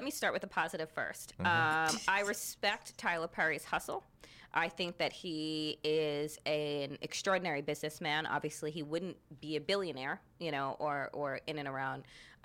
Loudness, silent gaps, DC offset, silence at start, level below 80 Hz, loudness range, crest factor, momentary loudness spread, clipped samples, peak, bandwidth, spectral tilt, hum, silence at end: -36 LUFS; none; under 0.1%; 0 s; -70 dBFS; 4 LU; 20 dB; 9 LU; under 0.1%; -16 dBFS; 16.5 kHz; -3.5 dB/octave; none; 0.1 s